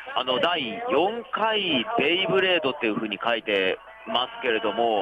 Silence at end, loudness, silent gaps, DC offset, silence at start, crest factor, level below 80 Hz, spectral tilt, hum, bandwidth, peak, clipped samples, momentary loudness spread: 0 s; -24 LUFS; none; under 0.1%; 0 s; 14 dB; -66 dBFS; -6 dB/octave; none; 9 kHz; -10 dBFS; under 0.1%; 6 LU